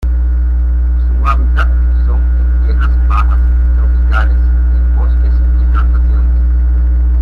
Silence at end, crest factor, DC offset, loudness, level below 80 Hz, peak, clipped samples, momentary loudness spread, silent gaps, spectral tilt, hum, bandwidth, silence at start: 0 s; 8 dB; under 0.1%; -13 LUFS; -10 dBFS; -2 dBFS; under 0.1%; 2 LU; none; -9 dB/octave; 60 Hz at -10 dBFS; 3.2 kHz; 0 s